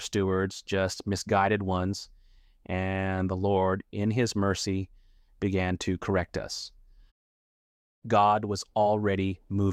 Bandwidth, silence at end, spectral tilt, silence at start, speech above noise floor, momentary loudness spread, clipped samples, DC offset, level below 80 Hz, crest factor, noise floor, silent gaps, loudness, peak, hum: 13.5 kHz; 0 s; -5.5 dB/octave; 0 s; 30 dB; 10 LU; under 0.1%; under 0.1%; -56 dBFS; 18 dB; -58 dBFS; 7.11-8.02 s; -28 LUFS; -10 dBFS; none